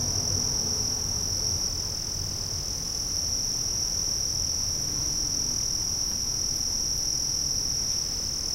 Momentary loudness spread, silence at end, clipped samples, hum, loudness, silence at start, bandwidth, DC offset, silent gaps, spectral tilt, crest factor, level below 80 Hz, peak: 4 LU; 0 s; under 0.1%; none; -25 LUFS; 0 s; 16 kHz; 0.1%; none; -1 dB/octave; 14 dB; -42 dBFS; -14 dBFS